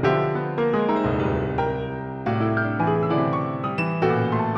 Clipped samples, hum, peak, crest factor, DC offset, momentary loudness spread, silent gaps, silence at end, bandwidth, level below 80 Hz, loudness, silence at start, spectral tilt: under 0.1%; none; -8 dBFS; 14 dB; under 0.1%; 5 LU; none; 0 s; 7 kHz; -44 dBFS; -23 LUFS; 0 s; -9 dB/octave